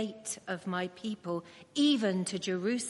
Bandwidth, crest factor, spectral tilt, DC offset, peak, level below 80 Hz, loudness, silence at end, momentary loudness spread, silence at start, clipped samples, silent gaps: 11.5 kHz; 16 dB; -4 dB/octave; under 0.1%; -18 dBFS; -80 dBFS; -33 LUFS; 0 s; 12 LU; 0 s; under 0.1%; none